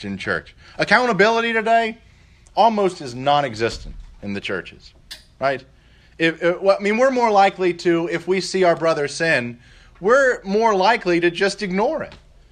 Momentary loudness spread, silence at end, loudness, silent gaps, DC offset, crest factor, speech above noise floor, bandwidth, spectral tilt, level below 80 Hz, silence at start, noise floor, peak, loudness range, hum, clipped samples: 13 LU; 0.35 s; -19 LUFS; none; under 0.1%; 20 dB; 30 dB; 10.5 kHz; -4.5 dB/octave; -48 dBFS; 0 s; -49 dBFS; 0 dBFS; 6 LU; none; under 0.1%